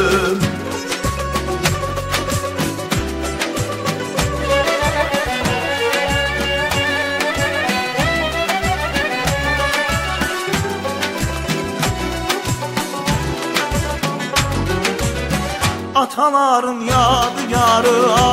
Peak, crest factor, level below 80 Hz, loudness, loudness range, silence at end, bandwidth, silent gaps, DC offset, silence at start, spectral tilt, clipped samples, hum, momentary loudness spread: 0 dBFS; 18 dB; -32 dBFS; -18 LUFS; 4 LU; 0 s; 16 kHz; none; under 0.1%; 0 s; -4 dB/octave; under 0.1%; none; 7 LU